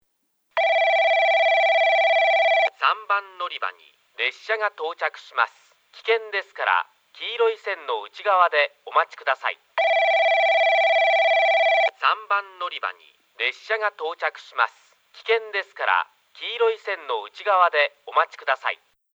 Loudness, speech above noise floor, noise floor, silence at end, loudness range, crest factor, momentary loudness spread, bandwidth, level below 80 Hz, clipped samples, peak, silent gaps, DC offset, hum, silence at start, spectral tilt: -21 LUFS; 44 dB; -69 dBFS; 0.4 s; 7 LU; 18 dB; 12 LU; 7.8 kHz; under -90 dBFS; under 0.1%; -4 dBFS; none; under 0.1%; none; 0.55 s; 1 dB/octave